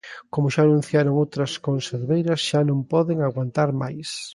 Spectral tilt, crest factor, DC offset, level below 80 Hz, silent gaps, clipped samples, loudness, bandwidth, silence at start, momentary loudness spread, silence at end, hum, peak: -6.5 dB/octave; 16 dB; under 0.1%; -62 dBFS; none; under 0.1%; -22 LUFS; 11.5 kHz; 0.05 s; 7 LU; 0 s; none; -6 dBFS